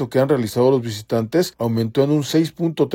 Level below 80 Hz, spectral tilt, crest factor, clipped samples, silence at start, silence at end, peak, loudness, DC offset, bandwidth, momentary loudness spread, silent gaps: -58 dBFS; -6.5 dB/octave; 14 dB; under 0.1%; 0 s; 0 s; -4 dBFS; -19 LUFS; under 0.1%; 16.5 kHz; 5 LU; none